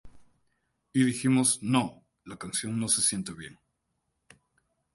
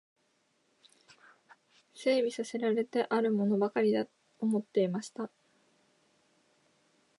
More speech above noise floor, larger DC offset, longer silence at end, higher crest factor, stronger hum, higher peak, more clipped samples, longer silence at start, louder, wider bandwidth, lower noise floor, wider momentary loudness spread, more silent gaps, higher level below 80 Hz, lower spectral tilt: first, 52 dB vs 44 dB; neither; second, 1.45 s vs 1.9 s; about the same, 20 dB vs 18 dB; neither; first, -10 dBFS vs -16 dBFS; neither; second, 0.05 s vs 1.95 s; first, -27 LUFS vs -31 LUFS; about the same, 12 kHz vs 11.5 kHz; first, -79 dBFS vs -74 dBFS; first, 19 LU vs 11 LU; neither; first, -64 dBFS vs -86 dBFS; second, -3.5 dB/octave vs -6 dB/octave